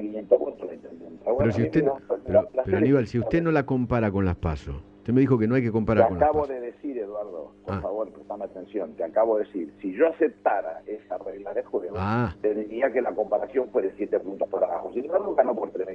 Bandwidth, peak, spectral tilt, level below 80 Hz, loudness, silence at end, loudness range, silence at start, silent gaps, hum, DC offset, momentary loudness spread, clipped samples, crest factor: 7.6 kHz; -4 dBFS; -9.5 dB/octave; -48 dBFS; -25 LUFS; 0 s; 4 LU; 0 s; none; none; under 0.1%; 13 LU; under 0.1%; 22 dB